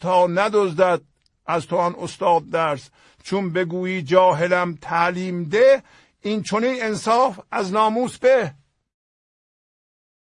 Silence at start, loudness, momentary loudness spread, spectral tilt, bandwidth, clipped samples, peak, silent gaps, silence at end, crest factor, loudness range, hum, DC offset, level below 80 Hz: 0 s; -20 LUFS; 10 LU; -5.5 dB/octave; 11 kHz; under 0.1%; -2 dBFS; none; 1.85 s; 20 dB; 3 LU; none; under 0.1%; -64 dBFS